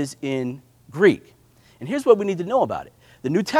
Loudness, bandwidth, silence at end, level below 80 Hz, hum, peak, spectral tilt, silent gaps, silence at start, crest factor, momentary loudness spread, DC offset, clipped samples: -22 LUFS; 15 kHz; 0 s; -62 dBFS; none; 0 dBFS; -6 dB/octave; none; 0 s; 22 dB; 16 LU; under 0.1%; under 0.1%